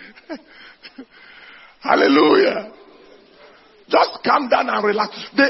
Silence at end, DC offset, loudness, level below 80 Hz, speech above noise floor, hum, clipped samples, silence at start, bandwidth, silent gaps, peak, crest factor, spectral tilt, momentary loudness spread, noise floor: 0 s; under 0.1%; -17 LUFS; -64 dBFS; 30 dB; none; under 0.1%; 0 s; 6 kHz; none; 0 dBFS; 18 dB; -5.5 dB/octave; 23 LU; -48 dBFS